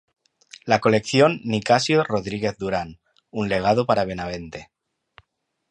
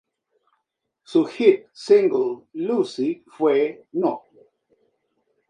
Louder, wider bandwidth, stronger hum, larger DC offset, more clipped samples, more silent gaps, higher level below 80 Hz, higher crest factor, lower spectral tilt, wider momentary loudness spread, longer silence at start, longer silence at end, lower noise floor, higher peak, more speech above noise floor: about the same, -21 LUFS vs -21 LUFS; about the same, 10.5 kHz vs 9.8 kHz; neither; neither; neither; neither; first, -52 dBFS vs -78 dBFS; about the same, 20 dB vs 20 dB; about the same, -5.5 dB/octave vs -6 dB/octave; first, 16 LU vs 10 LU; second, 0.65 s vs 1.1 s; second, 1.1 s vs 1.3 s; second, -73 dBFS vs -78 dBFS; about the same, -2 dBFS vs -2 dBFS; second, 52 dB vs 57 dB